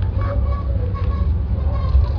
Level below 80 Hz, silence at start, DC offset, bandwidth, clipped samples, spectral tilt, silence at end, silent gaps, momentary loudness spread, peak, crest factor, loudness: -20 dBFS; 0 s; under 0.1%; 5.2 kHz; under 0.1%; -10.5 dB/octave; 0 s; none; 3 LU; -4 dBFS; 14 dB; -21 LUFS